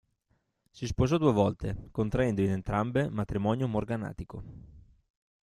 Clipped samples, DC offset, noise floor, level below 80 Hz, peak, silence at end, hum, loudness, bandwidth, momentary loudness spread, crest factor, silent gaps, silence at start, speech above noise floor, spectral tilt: under 0.1%; under 0.1%; -75 dBFS; -48 dBFS; -10 dBFS; 0.8 s; none; -30 LUFS; 12 kHz; 15 LU; 20 dB; none; 0.75 s; 46 dB; -7.5 dB/octave